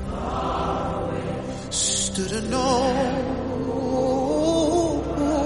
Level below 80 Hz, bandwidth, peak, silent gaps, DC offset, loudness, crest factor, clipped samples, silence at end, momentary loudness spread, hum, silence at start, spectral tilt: -38 dBFS; 11.5 kHz; -8 dBFS; none; under 0.1%; -24 LUFS; 16 dB; under 0.1%; 0 s; 7 LU; none; 0 s; -4.5 dB/octave